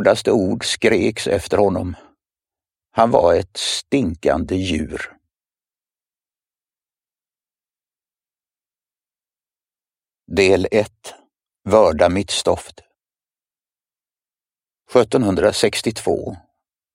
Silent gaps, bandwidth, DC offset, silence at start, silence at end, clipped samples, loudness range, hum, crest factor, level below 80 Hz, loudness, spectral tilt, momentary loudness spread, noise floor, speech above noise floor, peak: none; 16 kHz; under 0.1%; 0 s; 0.55 s; under 0.1%; 6 LU; none; 20 dB; -46 dBFS; -18 LUFS; -4.5 dB/octave; 14 LU; under -90 dBFS; over 73 dB; 0 dBFS